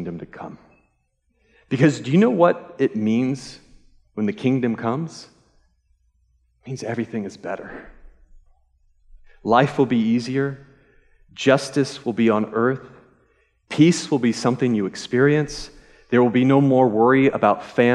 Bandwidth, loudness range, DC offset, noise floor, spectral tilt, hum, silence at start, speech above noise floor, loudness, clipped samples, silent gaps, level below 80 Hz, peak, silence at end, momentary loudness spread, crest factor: 11 kHz; 14 LU; under 0.1%; -68 dBFS; -6.5 dB/octave; none; 0 s; 49 dB; -20 LUFS; under 0.1%; none; -54 dBFS; -2 dBFS; 0 s; 18 LU; 18 dB